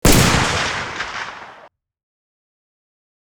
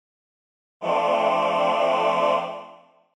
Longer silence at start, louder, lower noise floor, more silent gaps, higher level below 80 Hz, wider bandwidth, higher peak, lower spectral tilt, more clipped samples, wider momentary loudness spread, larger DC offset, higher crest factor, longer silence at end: second, 0.05 s vs 0.8 s; first, -18 LUFS vs -22 LUFS; about the same, -47 dBFS vs -49 dBFS; neither; first, -30 dBFS vs -76 dBFS; first, over 20 kHz vs 11 kHz; first, 0 dBFS vs -10 dBFS; about the same, -3.5 dB/octave vs -4.5 dB/octave; neither; first, 17 LU vs 11 LU; neither; first, 20 dB vs 14 dB; first, 1.55 s vs 0.45 s